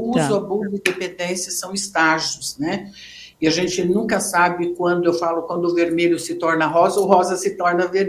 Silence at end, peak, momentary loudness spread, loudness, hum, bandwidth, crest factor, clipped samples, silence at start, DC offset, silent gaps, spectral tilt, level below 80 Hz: 0 s; 0 dBFS; 8 LU; -19 LUFS; none; 15.5 kHz; 18 dB; under 0.1%; 0 s; under 0.1%; none; -4 dB/octave; -58 dBFS